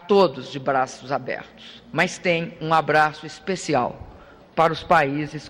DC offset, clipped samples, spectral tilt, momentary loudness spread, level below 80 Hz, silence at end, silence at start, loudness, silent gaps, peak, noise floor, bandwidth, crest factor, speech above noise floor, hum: under 0.1%; under 0.1%; -5 dB/octave; 13 LU; -54 dBFS; 0 s; 0.05 s; -22 LUFS; none; -6 dBFS; -46 dBFS; 15.5 kHz; 18 dB; 24 dB; none